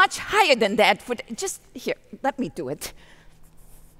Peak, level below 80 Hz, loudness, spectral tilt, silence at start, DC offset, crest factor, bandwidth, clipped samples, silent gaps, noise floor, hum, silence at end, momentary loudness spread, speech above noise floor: -4 dBFS; -52 dBFS; -23 LUFS; -2.5 dB/octave; 0 s; under 0.1%; 20 dB; 16 kHz; under 0.1%; none; -48 dBFS; none; 0.55 s; 14 LU; 23 dB